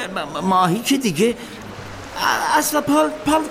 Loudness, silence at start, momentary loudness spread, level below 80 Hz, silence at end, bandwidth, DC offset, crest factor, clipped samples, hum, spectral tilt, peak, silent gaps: -18 LUFS; 0 s; 16 LU; -48 dBFS; 0 s; 16 kHz; under 0.1%; 16 dB; under 0.1%; none; -4 dB/octave; -4 dBFS; none